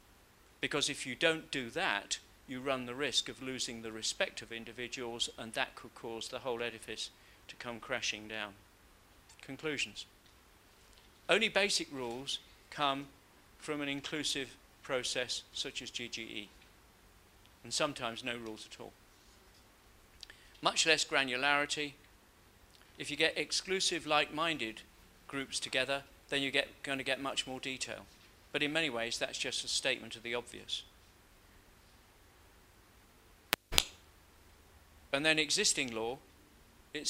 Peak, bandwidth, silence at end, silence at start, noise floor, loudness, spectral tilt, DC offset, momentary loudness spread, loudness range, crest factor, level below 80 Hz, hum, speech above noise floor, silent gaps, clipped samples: 0 dBFS; 16 kHz; 0 s; 0.6 s; -63 dBFS; -35 LUFS; -1.5 dB/octave; under 0.1%; 16 LU; 8 LU; 38 dB; -64 dBFS; none; 27 dB; none; under 0.1%